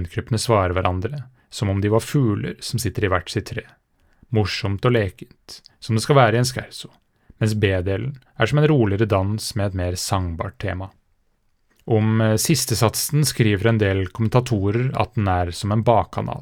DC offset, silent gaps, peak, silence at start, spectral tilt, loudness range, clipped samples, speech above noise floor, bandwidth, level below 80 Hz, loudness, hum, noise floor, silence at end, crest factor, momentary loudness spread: under 0.1%; none; 0 dBFS; 0 s; -5.5 dB/octave; 4 LU; under 0.1%; 44 dB; 19.5 kHz; -48 dBFS; -21 LUFS; none; -64 dBFS; 0 s; 20 dB; 13 LU